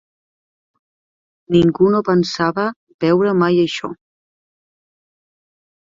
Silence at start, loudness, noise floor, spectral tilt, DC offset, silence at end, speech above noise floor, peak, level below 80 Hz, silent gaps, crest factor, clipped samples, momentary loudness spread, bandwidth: 1.5 s; -16 LUFS; under -90 dBFS; -7 dB/octave; under 0.1%; 2 s; over 75 dB; -2 dBFS; -54 dBFS; 2.76-2.87 s, 2.94-2.99 s; 18 dB; under 0.1%; 9 LU; 7.6 kHz